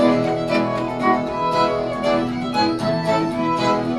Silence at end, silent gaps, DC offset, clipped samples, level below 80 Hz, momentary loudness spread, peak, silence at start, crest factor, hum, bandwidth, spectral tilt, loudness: 0 s; none; under 0.1%; under 0.1%; -46 dBFS; 2 LU; -4 dBFS; 0 s; 16 dB; none; 12.5 kHz; -6 dB/octave; -20 LUFS